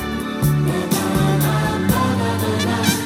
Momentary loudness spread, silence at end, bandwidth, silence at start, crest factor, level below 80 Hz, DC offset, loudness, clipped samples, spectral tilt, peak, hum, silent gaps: 3 LU; 0 s; 17 kHz; 0 s; 16 dB; -38 dBFS; under 0.1%; -19 LUFS; under 0.1%; -5.5 dB/octave; -2 dBFS; none; none